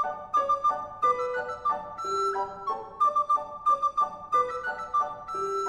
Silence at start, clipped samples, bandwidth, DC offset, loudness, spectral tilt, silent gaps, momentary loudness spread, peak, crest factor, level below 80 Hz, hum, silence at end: 0 s; under 0.1%; 11 kHz; under 0.1%; -28 LUFS; -3.5 dB/octave; none; 7 LU; -14 dBFS; 14 dB; -62 dBFS; none; 0 s